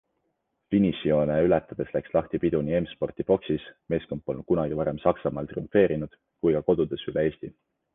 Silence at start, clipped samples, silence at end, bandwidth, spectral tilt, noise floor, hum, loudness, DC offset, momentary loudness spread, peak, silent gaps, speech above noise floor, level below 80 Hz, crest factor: 0.7 s; under 0.1%; 0.45 s; 3.9 kHz; -10.5 dB/octave; -77 dBFS; none; -26 LUFS; under 0.1%; 9 LU; -6 dBFS; none; 51 dB; -50 dBFS; 20 dB